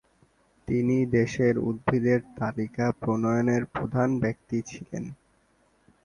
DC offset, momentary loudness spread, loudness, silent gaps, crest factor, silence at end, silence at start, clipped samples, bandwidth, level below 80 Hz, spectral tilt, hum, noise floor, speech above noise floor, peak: under 0.1%; 13 LU; -27 LUFS; none; 20 dB; 0.9 s; 0.7 s; under 0.1%; 10 kHz; -54 dBFS; -8 dB/octave; none; -66 dBFS; 40 dB; -8 dBFS